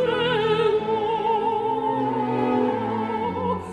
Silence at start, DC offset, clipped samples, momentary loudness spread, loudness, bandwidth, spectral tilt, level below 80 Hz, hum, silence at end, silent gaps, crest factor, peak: 0 s; under 0.1%; under 0.1%; 5 LU; -23 LUFS; 9.6 kHz; -7 dB/octave; -56 dBFS; none; 0 s; none; 14 dB; -10 dBFS